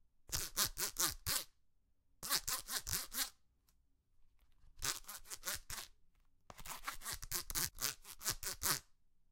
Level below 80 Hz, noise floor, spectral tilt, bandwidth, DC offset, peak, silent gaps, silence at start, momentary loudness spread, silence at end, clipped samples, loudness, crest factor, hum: -58 dBFS; -74 dBFS; 0 dB/octave; 17 kHz; under 0.1%; -12 dBFS; none; 0.2 s; 12 LU; 0.4 s; under 0.1%; -40 LUFS; 32 dB; none